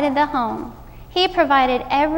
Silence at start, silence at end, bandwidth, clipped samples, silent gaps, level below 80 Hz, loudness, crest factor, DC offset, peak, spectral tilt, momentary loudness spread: 0 s; 0 s; 16.5 kHz; under 0.1%; none; -42 dBFS; -18 LUFS; 16 dB; under 0.1%; -4 dBFS; -5 dB/octave; 12 LU